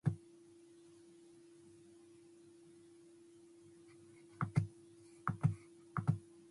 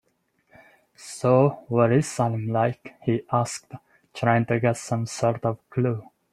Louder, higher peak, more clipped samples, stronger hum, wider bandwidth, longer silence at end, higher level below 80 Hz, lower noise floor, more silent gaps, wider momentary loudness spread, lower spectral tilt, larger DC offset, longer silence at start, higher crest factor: second, -41 LUFS vs -24 LUFS; second, -20 dBFS vs -4 dBFS; neither; neither; about the same, 11.5 kHz vs 12.5 kHz; about the same, 0.3 s vs 0.3 s; second, -68 dBFS vs -62 dBFS; second, -62 dBFS vs -69 dBFS; neither; first, 23 LU vs 11 LU; first, -8 dB/octave vs -6.5 dB/octave; neither; second, 0.05 s vs 1 s; about the same, 24 dB vs 20 dB